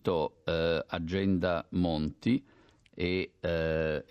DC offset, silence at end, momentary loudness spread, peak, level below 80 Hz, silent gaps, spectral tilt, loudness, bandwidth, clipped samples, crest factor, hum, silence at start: under 0.1%; 0.1 s; 4 LU; -14 dBFS; -54 dBFS; none; -8 dB/octave; -31 LUFS; 8.8 kHz; under 0.1%; 16 dB; none; 0.05 s